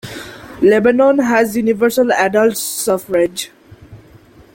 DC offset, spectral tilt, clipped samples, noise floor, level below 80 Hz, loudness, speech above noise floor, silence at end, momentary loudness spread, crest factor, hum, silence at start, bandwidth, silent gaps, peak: under 0.1%; -4 dB/octave; under 0.1%; -44 dBFS; -52 dBFS; -14 LUFS; 30 dB; 0.6 s; 17 LU; 14 dB; none; 0.05 s; 17 kHz; none; 0 dBFS